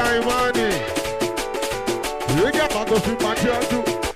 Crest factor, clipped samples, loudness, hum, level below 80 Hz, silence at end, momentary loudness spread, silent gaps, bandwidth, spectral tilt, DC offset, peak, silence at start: 10 dB; under 0.1%; -21 LUFS; none; -40 dBFS; 0 s; 6 LU; none; 15.5 kHz; -4 dB/octave; under 0.1%; -10 dBFS; 0 s